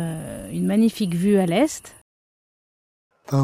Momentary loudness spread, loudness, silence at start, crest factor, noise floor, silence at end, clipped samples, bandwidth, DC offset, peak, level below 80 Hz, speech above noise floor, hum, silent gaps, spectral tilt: 13 LU; -21 LUFS; 0 s; 14 dB; under -90 dBFS; 0 s; under 0.1%; 16 kHz; under 0.1%; -8 dBFS; -54 dBFS; over 70 dB; none; 2.01-3.11 s; -6.5 dB/octave